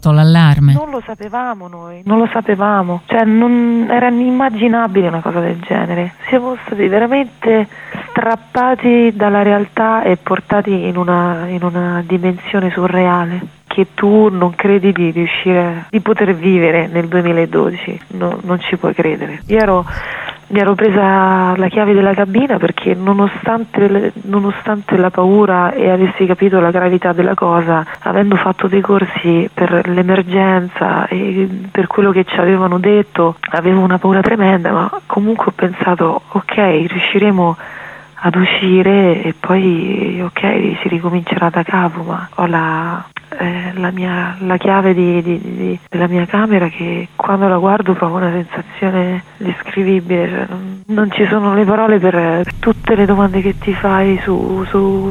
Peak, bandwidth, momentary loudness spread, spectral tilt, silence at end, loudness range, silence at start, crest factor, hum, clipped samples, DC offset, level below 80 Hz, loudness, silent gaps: 0 dBFS; 6.8 kHz; 8 LU; -8.5 dB/octave; 0 s; 3 LU; 0 s; 12 dB; none; under 0.1%; under 0.1%; -42 dBFS; -13 LUFS; none